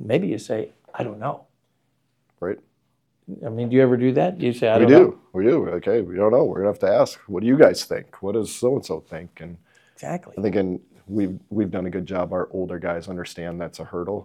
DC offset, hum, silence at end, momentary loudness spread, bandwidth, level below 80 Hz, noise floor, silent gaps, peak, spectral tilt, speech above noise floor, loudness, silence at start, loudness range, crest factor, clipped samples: under 0.1%; none; 0 s; 17 LU; 14.5 kHz; -64 dBFS; -70 dBFS; none; 0 dBFS; -7 dB/octave; 49 dB; -21 LUFS; 0 s; 10 LU; 22 dB; under 0.1%